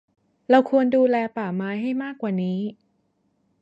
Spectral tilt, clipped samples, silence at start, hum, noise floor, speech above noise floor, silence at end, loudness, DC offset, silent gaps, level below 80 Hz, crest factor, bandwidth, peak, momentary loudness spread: -8.5 dB/octave; under 0.1%; 0.5 s; none; -69 dBFS; 47 dB; 0.9 s; -22 LUFS; under 0.1%; none; -72 dBFS; 18 dB; 7.4 kHz; -4 dBFS; 10 LU